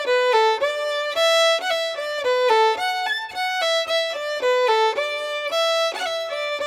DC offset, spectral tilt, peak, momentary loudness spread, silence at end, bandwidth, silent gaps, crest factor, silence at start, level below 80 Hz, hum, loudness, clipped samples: under 0.1%; 1 dB/octave; -8 dBFS; 7 LU; 0 s; 17 kHz; none; 14 dB; 0 s; -70 dBFS; none; -20 LUFS; under 0.1%